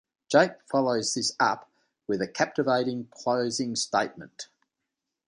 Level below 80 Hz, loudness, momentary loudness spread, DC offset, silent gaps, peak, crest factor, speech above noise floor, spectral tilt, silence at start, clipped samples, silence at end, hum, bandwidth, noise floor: -72 dBFS; -27 LUFS; 17 LU; under 0.1%; none; -6 dBFS; 22 dB; 58 dB; -3.5 dB/octave; 0.3 s; under 0.1%; 0.85 s; none; 11 kHz; -85 dBFS